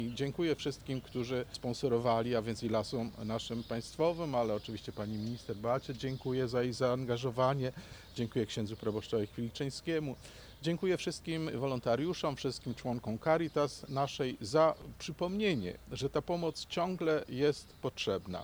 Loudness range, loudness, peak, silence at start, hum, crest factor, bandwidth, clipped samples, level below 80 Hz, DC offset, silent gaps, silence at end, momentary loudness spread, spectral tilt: 3 LU; -35 LUFS; -16 dBFS; 0 s; none; 20 dB; over 20 kHz; under 0.1%; -60 dBFS; under 0.1%; none; 0 s; 8 LU; -6 dB/octave